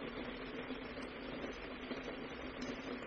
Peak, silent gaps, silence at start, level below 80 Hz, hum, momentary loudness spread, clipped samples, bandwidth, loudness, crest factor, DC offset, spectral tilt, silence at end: -30 dBFS; none; 0 s; -60 dBFS; none; 2 LU; under 0.1%; 6.8 kHz; -46 LUFS; 14 dB; under 0.1%; -3 dB/octave; 0 s